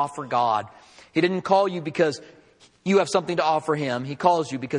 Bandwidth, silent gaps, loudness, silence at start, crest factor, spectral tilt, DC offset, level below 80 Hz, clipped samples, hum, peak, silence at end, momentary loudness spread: 11 kHz; none; -23 LUFS; 0 s; 20 dB; -5.5 dB/octave; under 0.1%; -68 dBFS; under 0.1%; none; -4 dBFS; 0 s; 7 LU